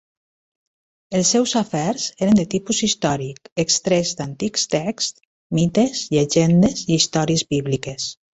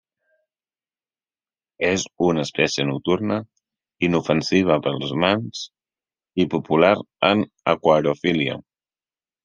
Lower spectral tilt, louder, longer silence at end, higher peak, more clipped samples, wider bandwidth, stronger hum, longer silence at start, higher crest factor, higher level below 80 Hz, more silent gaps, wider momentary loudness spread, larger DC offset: about the same, -4.5 dB/octave vs -5 dB/octave; about the same, -19 LUFS vs -21 LUFS; second, 0.25 s vs 0.85 s; about the same, -4 dBFS vs -2 dBFS; neither; second, 8.2 kHz vs 9.8 kHz; neither; second, 1.1 s vs 1.8 s; about the same, 16 dB vs 20 dB; first, -52 dBFS vs -60 dBFS; first, 3.52-3.56 s, 5.25-5.50 s vs none; about the same, 9 LU vs 8 LU; neither